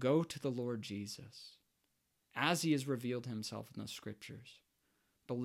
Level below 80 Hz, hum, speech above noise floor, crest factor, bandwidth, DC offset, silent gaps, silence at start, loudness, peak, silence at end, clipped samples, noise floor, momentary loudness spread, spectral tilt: -80 dBFS; none; 43 dB; 24 dB; 16.5 kHz; under 0.1%; none; 0 s; -39 LUFS; -16 dBFS; 0 s; under 0.1%; -82 dBFS; 19 LU; -5 dB/octave